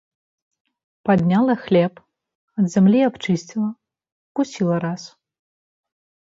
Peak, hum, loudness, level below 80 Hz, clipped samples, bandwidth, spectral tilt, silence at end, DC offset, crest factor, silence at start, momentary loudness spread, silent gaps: -4 dBFS; none; -20 LUFS; -60 dBFS; under 0.1%; 7.8 kHz; -7.5 dB/octave; 1.25 s; under 0.1%; 18 dB; 1.05 s; 13 LU; 2.35-2.48 s, 4.12-4.35 s